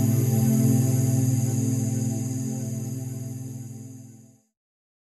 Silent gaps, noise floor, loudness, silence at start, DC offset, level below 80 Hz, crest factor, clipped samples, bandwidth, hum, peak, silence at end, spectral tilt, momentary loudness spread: none; -51 dBFS; -25 LUFS; 0 s; under 0.1%; -64 dBFS; 16 dB; under 0.1%; 13 kHz; none; -10 dBFS; 0.85 s; -7 dB/octave; 17 LU